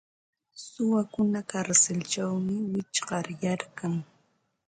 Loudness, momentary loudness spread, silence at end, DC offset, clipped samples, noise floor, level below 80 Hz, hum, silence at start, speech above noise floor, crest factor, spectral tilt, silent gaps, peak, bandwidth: -28 LUFS; 11 LU; 0.65 s; under 0.1%; under 0.1%; -71 dBFS; -68 dBFS; none; 0.55 s; 43 dB; 22 dB; -4 dB/octave; none; -8 dBFS; 9.6 kHz